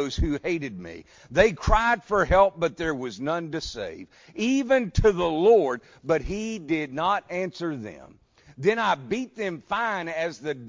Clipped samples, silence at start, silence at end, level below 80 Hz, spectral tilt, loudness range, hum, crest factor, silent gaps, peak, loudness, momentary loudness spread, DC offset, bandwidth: under 0.1%; 0 s; 0 s; -38 dBFS; -5.5 dB/octave; 4 LU; none; 20 dB; none; -6 dBFS; -25 LUFS; 14 LU; under 0.1%; 7.6 kHz